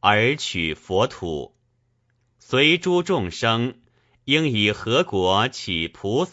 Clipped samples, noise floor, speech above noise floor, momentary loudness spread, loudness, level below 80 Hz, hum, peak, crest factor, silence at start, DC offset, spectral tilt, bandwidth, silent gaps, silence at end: under 0.1%; -67 dBFS; 46 dB; 12 LU; -21 LUFS; -52 dBFS; none; -2 dBFS; 20 dB; 0 s; under 0.1%; -4.5 dB/octave; 8 kHz; none; 0 s